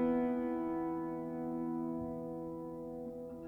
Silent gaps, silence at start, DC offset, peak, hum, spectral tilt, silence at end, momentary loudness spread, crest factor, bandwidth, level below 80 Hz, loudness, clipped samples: none; 0 s; under 0.1%; -22 dBFS; none; -9.5 dB/octave; 0 s; 10 LU; 14 dB; 3.4 kHz; -64 dBFS; -39 LUFS; under 0.1%